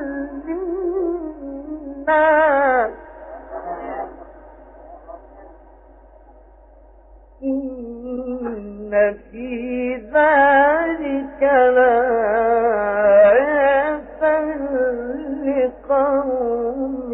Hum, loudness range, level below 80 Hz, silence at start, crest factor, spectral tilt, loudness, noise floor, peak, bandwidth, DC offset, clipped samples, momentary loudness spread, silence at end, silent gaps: none; 17 LU; -46 dBFS; 0 s; 16 dB; -9 dB/octave; -18 LUFS; -47 dBFS; -4 dBFS; 3.9 kHz; under 0.1%; under 0.1%; 18 LU; 0 s; none